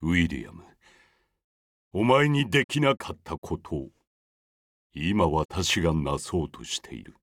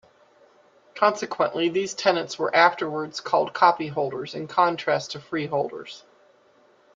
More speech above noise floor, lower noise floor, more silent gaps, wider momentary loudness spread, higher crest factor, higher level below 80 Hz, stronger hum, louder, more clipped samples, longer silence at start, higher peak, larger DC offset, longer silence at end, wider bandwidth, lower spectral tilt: about the same, 38 dB vs 35 dB; first, -64 dBFS vs -59 dBFS; first, 1.44-1.91 s, 2.64-2.69 s, 3.38-3.42 s, 4.07-4.90 s, 5.45-5.49 s vs none; first, 16 LU vs 12 LU; about the same, 20 dB vs 22 dB; first, -48 dBFS vs -72 dBFS; neither; about the same, -26 LUFS vs -24 LUFS; neither; second, 0 s vs 0.95 s; second, -6 dBFS vs -2 dBFS; neither; second, 0.1 s vs 0.95 s; first, 16 kHz vs 9.2 kHz; about the same, -5 dB/octave vs -4 dB/octave